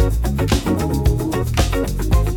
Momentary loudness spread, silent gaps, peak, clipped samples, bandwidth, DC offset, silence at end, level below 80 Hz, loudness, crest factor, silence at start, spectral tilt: 2 LU; none; -4 dBFS; under 0.1%; 17.5 kHz; under 0.1%; 0 s; -20 dBFS; -19 LUFS; 12 dB; 0 s; -6 dB/octave